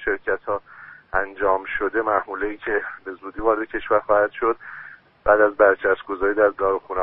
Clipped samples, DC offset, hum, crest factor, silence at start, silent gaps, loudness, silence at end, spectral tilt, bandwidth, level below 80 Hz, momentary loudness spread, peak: under 0.1%; under 0.1%; none; 20 dB; 0 s; none; -21 LUFS; 0 s; -3 dB/octave; 4 kHz; -48 dBFS; 13 LU; -2 dBFS